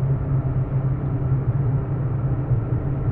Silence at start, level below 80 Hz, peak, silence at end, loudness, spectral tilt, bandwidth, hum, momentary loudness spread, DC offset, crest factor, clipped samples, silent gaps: 0 s; -32 dBFS; -10 dBFS; 0 s; -23 LUFS; -13.5 dB/octave; 2.8 kHz; none; 2 LU; under 0.1%; 12 dB; under 0.1%; none